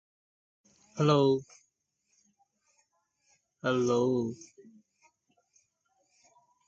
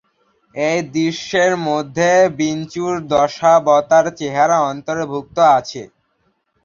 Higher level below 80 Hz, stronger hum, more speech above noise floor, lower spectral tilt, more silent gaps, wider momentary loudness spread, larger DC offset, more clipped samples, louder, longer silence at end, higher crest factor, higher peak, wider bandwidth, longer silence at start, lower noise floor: second, -72 dBFS vs -56 dBFS; neither; about the same, 51 dB vs 49 dB; first, -6.5 dB/octave vs -4.5 dB/octave; neither; first, 15 LU vs 10 LU; neither; neither; second, -28 LUFS vs -16 LUFS; first, 2.35 s vs 0.8 s; about the same, 20 dB vs 16 dB; second, -12 dBFS vs 0 dBFS; about the same, 7.8 kHz vs 7.6 kHz; first, 0.95 s vs 0.55 s; first, -78 dBFS vs -65 dBFS